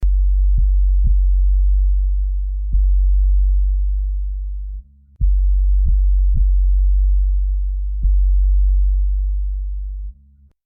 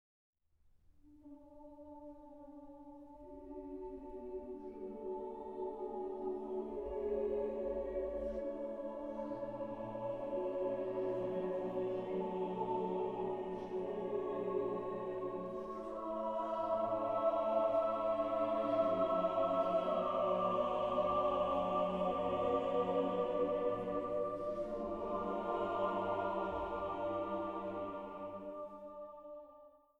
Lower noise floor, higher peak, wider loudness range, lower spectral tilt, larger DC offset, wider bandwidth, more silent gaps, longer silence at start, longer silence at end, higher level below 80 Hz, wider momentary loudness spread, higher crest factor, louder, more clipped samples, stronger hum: second, -50 dBFS vs -71 dBFS; first, -8 dBFS vs -22 dBFS; second, 2 LU vs 13 LU; first, -12 dB/octave vs -8 dB/octave; neither; second, 0.3 kHz vs 8 kHz; neither; second, 0 s vs 1.05 s; first, 0.55 s vs 0.25 s; first, -16 dBFS vs -62 dBFS; second, 9 LU vs 16 LU; second, 8 dB vs 16 dB; first, -20 LUFS vs -38 LUFS; neither; neither